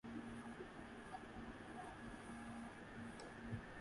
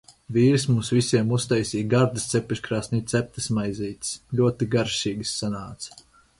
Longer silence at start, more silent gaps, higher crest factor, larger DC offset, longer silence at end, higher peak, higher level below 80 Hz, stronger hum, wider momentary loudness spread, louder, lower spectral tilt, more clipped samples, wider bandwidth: second, 0.05 s vs 0.3 s; neither; about the same, 18 dB vs 18 dB; neither; second, 0 s vs 0.4 s; second, -36 dBFS vs -6 dBFS; second, -66 dBFS vs -52 dBFS; neither; second, 3 LU vs 9 LU; second, -53 LUFS vs -24 LUFS; about the same, -5.5 dB/octave vs -5.5 dB/octave; neither; about the same, 11.5 kHz vs 11.5 kHz